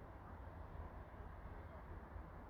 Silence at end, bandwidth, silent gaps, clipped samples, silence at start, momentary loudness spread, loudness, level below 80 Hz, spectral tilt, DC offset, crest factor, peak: 0 s; 15 kHz; none; under 0.1%; 0 s; 2 LU; -55 LUFS; -56 dBFS; -8.5 dB/octave; under 0.1%; 14 dB; -40 dBFS